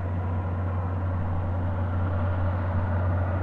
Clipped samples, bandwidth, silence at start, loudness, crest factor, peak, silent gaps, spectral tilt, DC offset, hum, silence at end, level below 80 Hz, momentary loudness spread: under 0.1%; 3.6 kHz; 0 s; -28 LUFS; 10 dB; -16 dBFS; none; -10.5 dB/octave; under 0.1%; none; 0 s; -44 dBFS; 2 LU